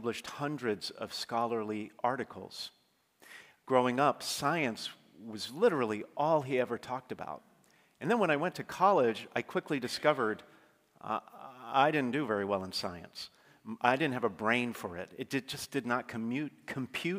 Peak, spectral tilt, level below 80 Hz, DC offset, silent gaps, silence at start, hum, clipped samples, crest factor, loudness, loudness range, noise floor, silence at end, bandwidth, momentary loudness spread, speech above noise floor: -10 dBFS; -4.5 dB/octave; -78 dBFS; under 0.1%; none; 0 s; none; under 0.1%; 24 dB; -33 LUFS; 3 LU; -66 dBFS; 0 s; 16 kHz; 16 LU; 34 dB